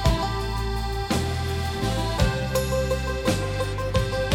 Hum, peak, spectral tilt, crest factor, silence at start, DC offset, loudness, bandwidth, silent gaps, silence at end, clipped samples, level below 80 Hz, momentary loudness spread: none; -8 dBFS; -5 dB/octave; 18 dB; 0 s; under 0.1%; -26 LUFS; 18.5 kHz; none; 0 s; under 0.1%; -30 dBFS; 4 LU